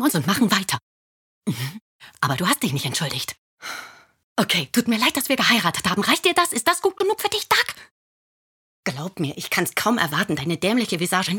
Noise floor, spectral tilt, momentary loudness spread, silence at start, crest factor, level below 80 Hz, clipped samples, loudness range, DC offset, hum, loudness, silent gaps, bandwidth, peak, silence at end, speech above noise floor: under -90 dBFS; -3.5 dB/octave; 12 LU; 0 s; 20 dB; -62 dBFS; under 0.1%; 6 LU; under 0.1%; none; -21 LUFS; 0.82-1.42 s, 1.81-1.99 s, 3.38-3.57 s, 4.24-4.36 s, 7.91-8.83 s; 18 kHz; -2 dBFS; 0 s; over 68 dB